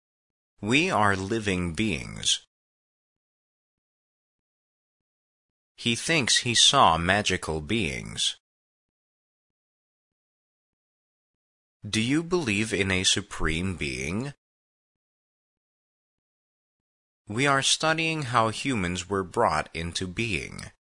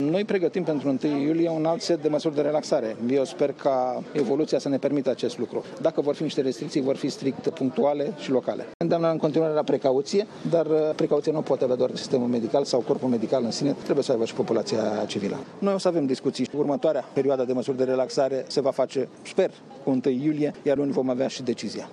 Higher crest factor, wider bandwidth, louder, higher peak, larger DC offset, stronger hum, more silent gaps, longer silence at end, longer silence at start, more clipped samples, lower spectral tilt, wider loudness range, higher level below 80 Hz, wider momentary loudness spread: first, 24 dB vs 16 dB; about the same, 11 kHz vs 11 kHz; about the same, -24 LUFS vs -25 LUFS; first, -4 dBFS vs -8 dBFS; neither; neither; first, 2.47-5.75 s, 8.40-11.80 s, 14.38-17.25 s vs 8.74-8.80 s; first, 0.3 s vs 0 s; first, 0.6 s vs 0 s; neither; second, -3 dB/octave vs -6 dB/octave; first, 13 LU vs 2 LU; first, -50 dBFS vs -74 dBFS; first, 10 LU vs 4 LU